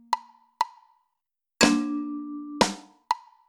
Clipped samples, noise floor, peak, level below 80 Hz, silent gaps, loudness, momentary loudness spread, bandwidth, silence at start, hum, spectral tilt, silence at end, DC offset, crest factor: under 0.1%; -85 dBFS; -2 dBFS; -58 dBFS; none; -27 LUFS; 14 LU; 19.5 kHz; 0.1 s; none; -3 dB/octave; 0.3 s; under 0.1%; 26 dB